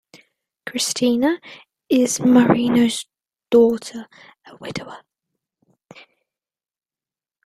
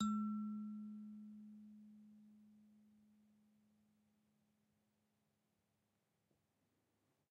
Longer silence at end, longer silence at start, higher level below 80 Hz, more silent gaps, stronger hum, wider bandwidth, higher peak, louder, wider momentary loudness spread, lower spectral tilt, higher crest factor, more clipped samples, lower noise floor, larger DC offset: second, 2.5 s vs 4.4 s; first, 0.65 s vs 0 s; first, -60 dBFS vs -88 dBFS; neither; neither; first, 13.5 kHz vs 7.4 kHz; first, -2 dBFS vs -30 dBFS; first, -18 LUFS vs -48 LUFS; second, 22 LU vs 25 LU; second, -4.5 dB/octave vs -7.5 dB/octave; about the same, 20 dB vs 22 dB; neither; first, under -90 dBFS vs -85 dBFS; neither